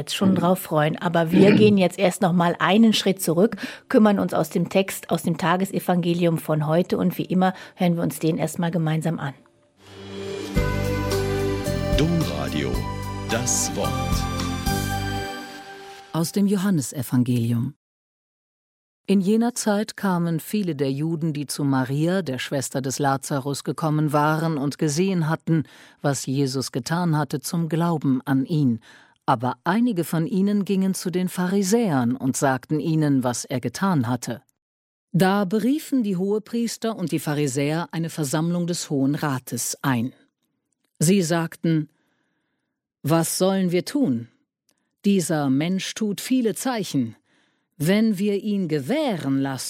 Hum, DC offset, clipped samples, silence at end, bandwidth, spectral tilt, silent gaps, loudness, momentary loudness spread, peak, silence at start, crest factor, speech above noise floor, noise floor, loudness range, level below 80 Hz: none; under 0.1%; under 0.1%; 0 s; 16.5 kHz; -5.5 dB/octave; 17.76-19.04 s, 34.62-35.08 s; -23 LUFS; 7 LU; -2 dBFS; 0 s; 20 dB; 57 dB; -79 dBFS; 5 LU; -42 dBFS